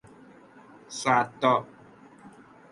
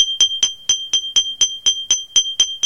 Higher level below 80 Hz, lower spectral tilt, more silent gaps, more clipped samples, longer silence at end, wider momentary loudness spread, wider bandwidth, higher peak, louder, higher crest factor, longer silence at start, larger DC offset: second, -72 dBFS vs -56 dBFS; first, -4 dB/octave vs 3.5 dB/octave; neither; neither; first, 0.4 s vs 0 s; first, 16 LU vs 4 LU; second, 11.5 kHz vs 15.5 kHz; second, -8 dBFS vs -2 dBFS; second, -25 LUFS vs -15 LUFS; first, 22 dB vs 16 dB; first, 0.9 s vs 0 s; neither